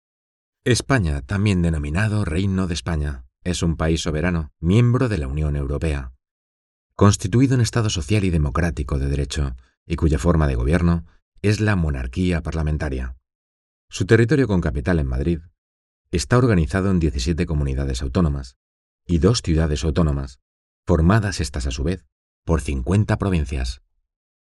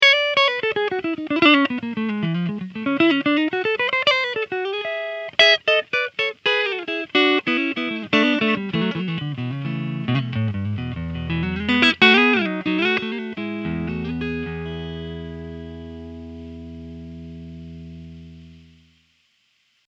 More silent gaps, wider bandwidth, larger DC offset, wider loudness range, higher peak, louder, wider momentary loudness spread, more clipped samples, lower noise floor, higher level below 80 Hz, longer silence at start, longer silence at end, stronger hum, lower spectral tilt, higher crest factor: first, 6.31-6.90 s, 9.77-9.86 s, 11.22-11.32 s, 13.35-13.88 s, 15.58-16.05 s, 18.56-18.99 s, 20.42-20.83 s, 22.12-22.43 s vs none; first, 12 kHz vs 8.2 kHz; neither; second, 2 LU vs 18 LU; about the same, 0 dBFS vs 0 dBFS; about the same, -21 LUFS vs -20 LUFS; second, 11 LU vs 22 LU; neither; first, under -90 dBFS vs -65 dBFS; first, -30 dBFS vs -48 dBFS; first, 0.65 s vs 0 s; second, 0.8 s vs 1.3 s; neither; about the same, -6.5 dB/octave vs -5.5 dB/octave; about the same, 20 dB vs 22 dB